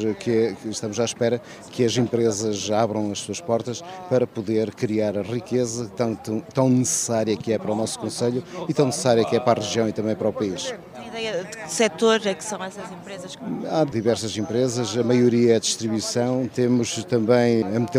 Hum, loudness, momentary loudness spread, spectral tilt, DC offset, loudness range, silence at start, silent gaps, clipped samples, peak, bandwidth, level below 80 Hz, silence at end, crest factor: none; -23 LUFS; 11 LU; -5 dB/octave; under 0.1%; 4 LU; 0 s; none; under 0.1%; -4 dBFS; 16 kHz; -64 dBFS; 0 s; 20 dB